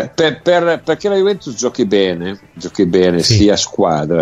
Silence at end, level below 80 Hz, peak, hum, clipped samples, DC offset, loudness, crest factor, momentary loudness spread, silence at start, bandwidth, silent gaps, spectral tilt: 0 s; -42 dBFS; 0 dBFS; none; under 0.1%; under 0.1%; -14 LUFS; 14 dB; 9 LU; 0 s; 13 kHz; none; -5 dB/octave